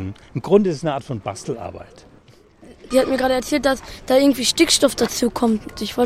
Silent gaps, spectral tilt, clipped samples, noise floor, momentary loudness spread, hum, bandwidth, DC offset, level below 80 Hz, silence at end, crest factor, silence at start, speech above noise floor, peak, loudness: none; -4 dB/octave; under 0.1%; -49 dBFS; 14 LU; none; 16.5 kHz; under 0.1%; -46 dBFS; 0 s; 20 dB; 0 s; 30 dB; 0 dBFS; -19 LUFS